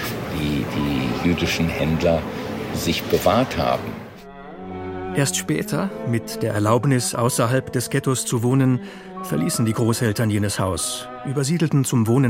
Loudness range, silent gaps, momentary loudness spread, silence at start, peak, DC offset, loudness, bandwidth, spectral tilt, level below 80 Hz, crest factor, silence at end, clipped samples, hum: 3 LU; none; 10 LU; 0 s; -2 dBFS; under 0.1%; -21 LUFS; 16.5 kHz; -5 dB/octave; -44 dBFS; 18 dB; 0 s; under 0.1%; none